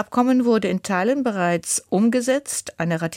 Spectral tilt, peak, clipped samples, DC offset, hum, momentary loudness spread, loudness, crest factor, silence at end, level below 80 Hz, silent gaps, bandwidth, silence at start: -5 dB/octave; -8 dBFS; under 0.1%; under 0.1%; none; 6 LU; -21 LUFS; 14 dB; 0 s; -62 dBFS; none; 16.5 kHz; 0 s